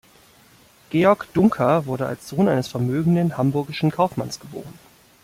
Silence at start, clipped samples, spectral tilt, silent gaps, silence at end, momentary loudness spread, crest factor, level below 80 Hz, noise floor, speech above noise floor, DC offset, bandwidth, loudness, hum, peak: 0.9 s; under 0.1%; -7.5 dB/octave; none; 0.5 s; 12 LU; 18 dB; -56 dBFS; -53 dBFS; 32 dB; under 0.1%; 16 kHz; -21 LUFS; none; -4 dBFS